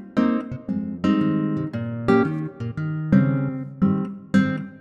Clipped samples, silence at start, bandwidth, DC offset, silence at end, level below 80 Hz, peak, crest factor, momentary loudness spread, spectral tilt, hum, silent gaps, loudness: under 0.1%; 0 s; 8 kHz; under 0.1%; 0 s; -52 dBFS; -4 dBFS; 18 dB; 9 LU; -9 dB/octave; none; none; -23 LUFS